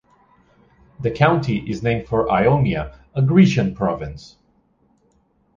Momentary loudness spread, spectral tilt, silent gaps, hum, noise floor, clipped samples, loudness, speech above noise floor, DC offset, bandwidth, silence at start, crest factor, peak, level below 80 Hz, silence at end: 14 LU; -8 dB/octave; none; none; -61 dBFS; under 0.1%; -19 LUFS; 43 dB; under 0.1%; 7.4 kHz; 1 s; 18 dB; -2 dBFS; -42 dBFS; 1.4 s